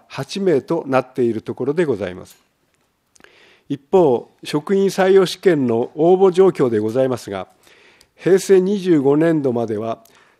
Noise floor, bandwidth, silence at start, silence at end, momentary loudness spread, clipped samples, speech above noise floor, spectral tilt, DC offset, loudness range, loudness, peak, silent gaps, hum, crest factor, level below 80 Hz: -64 dBFS; 13.5 kHz; 0.1 s; 0.45 s; 14 LU; under 0.1%; 48 dB; -6.5 dB/octave; under 0.1%; 6 LU; -17 LUFS; -2 dBFS; none; none; 16 dB; -64 dBFS